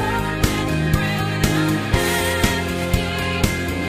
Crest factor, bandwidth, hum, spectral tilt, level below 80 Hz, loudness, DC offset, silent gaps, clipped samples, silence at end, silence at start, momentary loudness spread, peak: 18 dB; 15.5 kHz; none; -4.5 dB/octave; -30 dBFS; -20 LUFS; under 0.1%; none; under 0.1%; 0 s; 0 s; 3 LU; -2 dBFS